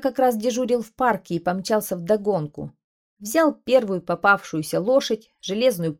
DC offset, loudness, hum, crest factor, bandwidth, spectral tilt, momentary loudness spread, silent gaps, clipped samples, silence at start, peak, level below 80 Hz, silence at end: under 0.1%; -22 LUFS; none; 18 dB; 17 kHz; -5 dB/octave; 9 LU; 2.84-3.17 s; under 0.1%; 0 s; -4 dBFS; -60 dBFS; 0.05 s